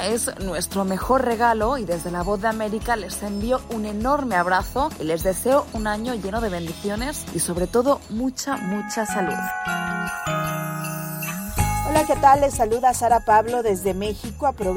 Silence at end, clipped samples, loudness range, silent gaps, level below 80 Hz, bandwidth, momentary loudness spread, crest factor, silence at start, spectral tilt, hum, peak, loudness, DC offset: 0 s; under 0.1%; 5 LU; none; -38 dBFS; 17 kHz; 9 LU; 18 dB; 0 s; -4.5 dB/octave; none; -4 dBFS; -22 LUFS; under 0.1%